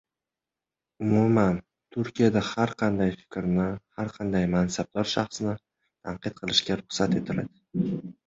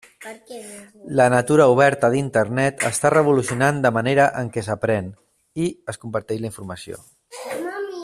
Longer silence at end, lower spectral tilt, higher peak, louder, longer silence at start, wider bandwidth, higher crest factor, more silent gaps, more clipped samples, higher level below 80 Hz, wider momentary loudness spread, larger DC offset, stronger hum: first, 0.15 s vs 0 s; about the same, -5.5 dB/octave vs -5.5 dB/octave; second, -6 dBFS vs -2 dBFS; second, -27 LUFS vs -19 LUFS; first, 1 s vs 0.2 s; second, 8 kHz vs 14.5 kHz; about the same, 20 dB vs 18 dB; neither; neither; first, -52 dBFS vs -58 dBFS; second, 11 LU vs 21 LU; neither; neither